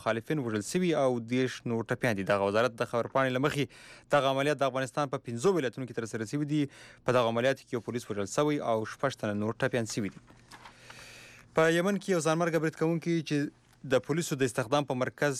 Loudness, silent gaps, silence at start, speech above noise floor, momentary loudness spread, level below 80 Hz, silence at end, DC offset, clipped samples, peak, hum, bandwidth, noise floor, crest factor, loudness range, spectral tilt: -30 LUFS; none; 0 s; 23 dB; 9 LU; -68 dBFS; 0 s; under 0.1%; under 0.1%; -16 dBFS; none; 15 kHz; -52 dBFS; 14 dB; 3 LU; -5.5 dB/octave